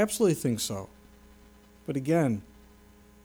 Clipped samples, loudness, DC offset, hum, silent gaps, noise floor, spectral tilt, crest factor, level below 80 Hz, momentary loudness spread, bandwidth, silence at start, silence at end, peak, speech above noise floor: under 0.1%; -29 LUFS; under 0.1%; none; none; -55 dBFS; -5.5 dB/octave; 18 dB; -58 dBFS; 15 LU; over 20 kHz; 0 s; 0.8 s; -14 dBFS; 28 dB